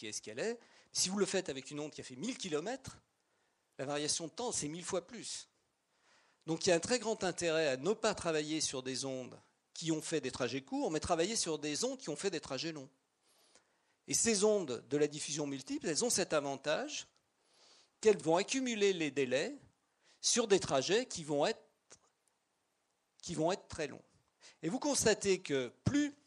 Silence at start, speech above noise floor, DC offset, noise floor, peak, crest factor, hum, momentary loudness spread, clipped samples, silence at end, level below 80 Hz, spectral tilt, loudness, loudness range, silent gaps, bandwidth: 0 s; 45 dB; under 0.1%; -81 dBFS; -16 dBFS; 22 dB; none; 12 LU; under 0.1%; 0.1 s; -68 dBFS; -3 dB/octave; -35 LUFS; 6 LU; none; 11.5 kHz